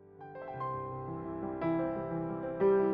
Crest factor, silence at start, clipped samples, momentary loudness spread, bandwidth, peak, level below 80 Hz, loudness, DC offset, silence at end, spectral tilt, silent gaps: 16 dB; 0 s; under 0.1%; 13 LU; 3.9 kHz; -18 dBFS; -62 dBFS; -35 LUFS; under 0.1%; 0 s; -8.5 dB/octave; none